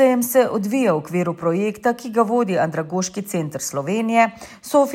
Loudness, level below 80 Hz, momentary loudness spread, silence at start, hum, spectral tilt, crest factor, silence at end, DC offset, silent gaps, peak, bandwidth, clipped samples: -20 LUFS; -62 dBFS; 7 LU; 0 s; none; -5.5 dB/octave; 16 dB; 0 s; under 0.1%; none; -4 dBFS; 16.5 kHz; under 0.1%